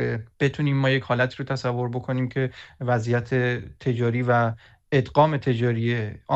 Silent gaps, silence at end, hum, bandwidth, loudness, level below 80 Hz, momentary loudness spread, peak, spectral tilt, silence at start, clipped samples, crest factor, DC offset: none; 0 s; none; 8 kHz; -24 LUFS; -54 dBFS; 7 LU; -4 dBFS; -7.5 dB/octave; 0 s; under 0.1%; 18 dB; under 0.1%